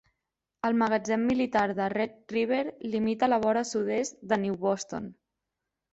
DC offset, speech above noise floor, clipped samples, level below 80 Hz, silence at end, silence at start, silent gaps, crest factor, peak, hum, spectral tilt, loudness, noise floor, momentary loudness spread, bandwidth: under 0.1%; 58 dB; under 0.1%; -64 dBFS; 0.8 s; 0.65 s; none; 16 dB; -12 dBFS; none; -5 dB/octave; -28 LUFS; -86 dBFS; 7 LU; 8.2 kHz